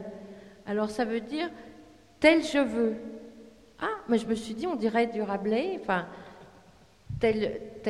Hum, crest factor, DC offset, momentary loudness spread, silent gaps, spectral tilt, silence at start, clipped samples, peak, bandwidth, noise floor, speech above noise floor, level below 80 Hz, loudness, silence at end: none; 24 dB; under 0.1%; 21 LU; none; -5.5 dB/octave; 0 s; under 0.1%; -6 dBFS; 12 kHz; -57 dBFS; 29 dB; -58 dBFS; -28 LUFS; 0 s